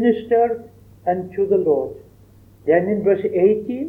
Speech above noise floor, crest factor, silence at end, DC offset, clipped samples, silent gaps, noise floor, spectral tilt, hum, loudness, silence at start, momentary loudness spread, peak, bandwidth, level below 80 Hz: 30 dB; 16 dB; 0 s; under 0.1%; under 0.1%; none; -48 dBFS; -9.5 dB/octave; none; -19 LUFS; 0 s; 10 LU; -2 dBFS; 3.8 kHz; -56 dBFS